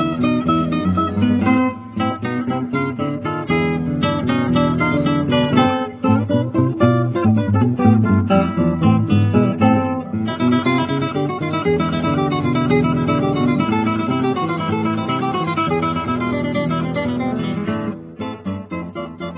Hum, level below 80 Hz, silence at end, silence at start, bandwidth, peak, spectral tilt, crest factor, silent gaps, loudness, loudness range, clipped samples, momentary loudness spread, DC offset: none; -40 dBFS; 0 s; 0 s; 4 kHz; -2 dBFS; -11.5 dB/octave; 16 dB; none; -18 LUFS; 4 LU; under 0.1%; 7 LU; under 0.1%